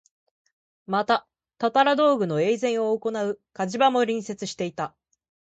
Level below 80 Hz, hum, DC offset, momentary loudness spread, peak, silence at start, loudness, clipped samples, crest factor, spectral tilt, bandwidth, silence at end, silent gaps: -70 dBFS; none; under 0.1%; 10 LU; -8 dBFS; 0.9 s; -24 LUFS; under 0.1%; 18 dB; -5 dB/octave; 8.8 kHz; 0.7 s; none